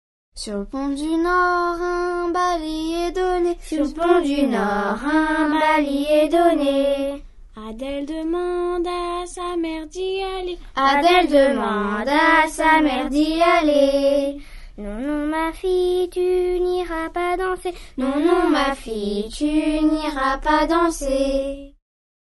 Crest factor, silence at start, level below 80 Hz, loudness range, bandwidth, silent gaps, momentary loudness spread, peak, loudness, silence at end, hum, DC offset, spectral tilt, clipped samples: 18 dB; 0.35 s; -40 dBFS; 5 LU; 11.5 kHz; none; 12 LU; -2 dBFS; -20 LUFS; 0.55 s; none; under 0.1%; -4.5 dB/octave; under 0.1%